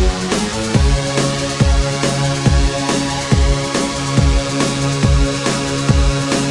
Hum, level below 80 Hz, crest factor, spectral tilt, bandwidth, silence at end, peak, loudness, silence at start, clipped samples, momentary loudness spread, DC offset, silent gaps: none; -20 dBFS; 14 dB; -5 dB/octave; 11.5 kHz; 0 s; 0 dBFS; -16 LUFS; 0 s; under 0.1%; 3 LU; under 0.1%; none